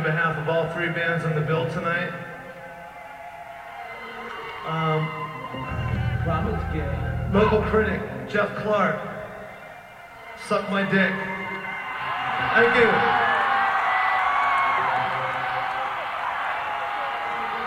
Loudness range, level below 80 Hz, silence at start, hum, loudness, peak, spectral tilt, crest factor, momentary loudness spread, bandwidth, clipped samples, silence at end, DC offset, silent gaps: 10 LU; -44 dBFS; 0 s; none; -24 LUFS; -6 dBFS; -6.5 dB/octave; 18 dB; 19 LU; 16 kHz; under 0.1%; 0 s; under 0.1%; none